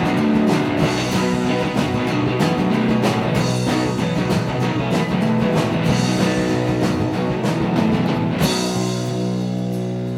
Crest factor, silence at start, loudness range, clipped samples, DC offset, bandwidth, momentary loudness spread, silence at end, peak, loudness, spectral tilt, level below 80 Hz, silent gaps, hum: 14 dB; 0 s; 1 LU; under 0.1%; under 0.1%; 16 kHz; 4 LU; 0 s; -4 dBFS; -19 LUFS; -6 dB/octave; -42 dBFS; none; none